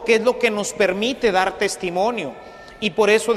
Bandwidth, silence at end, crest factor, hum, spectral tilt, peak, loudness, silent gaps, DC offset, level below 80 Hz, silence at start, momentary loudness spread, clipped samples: 14.5 kHz; 0 s; 16 dB; none; -3.5 dB/octave; -4 dBFS; -20 LUFS; none; under 0.1%; -52 dBFS; 0 s; 12 LU; under 0.1%